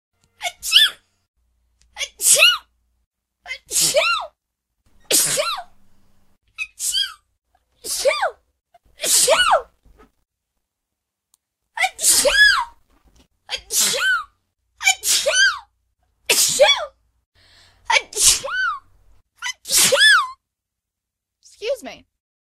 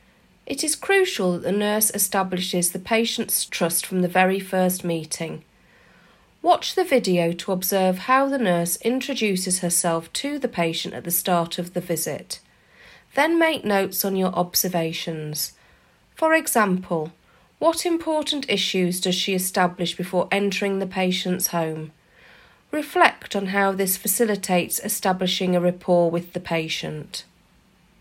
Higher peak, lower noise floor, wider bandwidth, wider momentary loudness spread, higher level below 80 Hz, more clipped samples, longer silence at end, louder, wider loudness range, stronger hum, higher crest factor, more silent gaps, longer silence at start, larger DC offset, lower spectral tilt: about the same, 0 dBFS vs 0 dBFS; first, -83 dBFS vs -58 dBFS; about the same, 16 kHz vs 16 kHz; first, 18 LU vs 9 LU; first, -52 dBFS vs -62 dBFS; neither; second, 0.65 s vs 0.8 s; first, -16 LUFS vs -22 LUFS; about the same, 5 LU vs 3 LU; neither; about the same, 22 dB vs 22 dB; first, 1.28-1.34 s, 3.06-3.11 s, 17.26-17.32 s vs none; about the same, 0.4 s vs 0.45 s; neither; second, 1.5 dB/octave vs -3.5 dB/octave